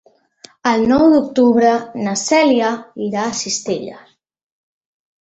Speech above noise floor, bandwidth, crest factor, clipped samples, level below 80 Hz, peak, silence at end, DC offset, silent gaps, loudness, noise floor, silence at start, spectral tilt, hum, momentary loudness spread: 31 dB; 8.4 kHz; 14 dB; under 0.1%; -52 dBFS; -2 dBFS; 1.2 s; under 0.1%; none; -16 LUFS; -46 dBFS; 0.65 s; -4 dB/octave; none; 11 LU